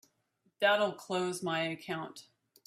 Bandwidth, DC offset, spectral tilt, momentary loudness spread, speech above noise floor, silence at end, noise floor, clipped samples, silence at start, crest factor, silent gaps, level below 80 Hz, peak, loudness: 15 kHz; under 0.1%; -4 dB/octave; 13 LU; 43 dB; 0.45 s; -76 dBFS; under 0.1%; 0.6 s; 20 dB; none; -80 dBFS; -16 dBFS; -33 LUFS